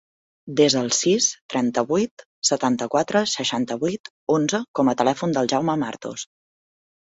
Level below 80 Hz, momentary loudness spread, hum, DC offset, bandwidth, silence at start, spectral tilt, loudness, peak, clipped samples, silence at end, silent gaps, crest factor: -64 dBFS; 10 LU; none; under 0.1%; 8 kHz; 0.45 s; -3.5 dB/octave; -22 LUFS; -4 dBFS; under 0.1%; 0.85 s; 1.41-1.49 s, 2.11-2.17 s, 2.25-2.42 s, 4.00-4.04 s, 4.10-4.27 s, 4.68-4.74 s; 18 dB